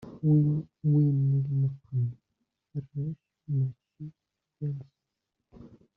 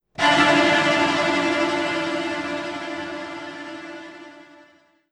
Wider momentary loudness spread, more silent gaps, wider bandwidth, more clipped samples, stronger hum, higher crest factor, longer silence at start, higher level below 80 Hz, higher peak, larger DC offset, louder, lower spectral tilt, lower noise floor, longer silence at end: about the same, 20 LU vs 20 LU; neither; second, 1.2 kHz vs 12 kHz; neither; neither; about the same, 16 dB vs 20 dB; second, 0 s vs 0.2 s; second, -66 dBFS vs -60 dBFS; second, -14 dBFS vs -4 dBFS; neither; second, -29 LUFS vs -20 LUFS; first, -14.5 dB/octave vs -3.5 dB/octave; first, -84 dBFS vs -55 dBFS; second, 0.3 s vs 0.7 s